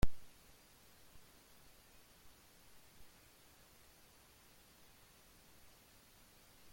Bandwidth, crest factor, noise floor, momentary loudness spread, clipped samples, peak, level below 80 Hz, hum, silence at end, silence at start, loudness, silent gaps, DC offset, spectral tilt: 16.5 kHz; 26 dB; -65 dBFS; 0 LU; under 0.1%; -18 dBFS; -54 dBFS; none; 6.5 s; 0.05 s; -60 LUFS; none; under 0.1%; -5 dB/octave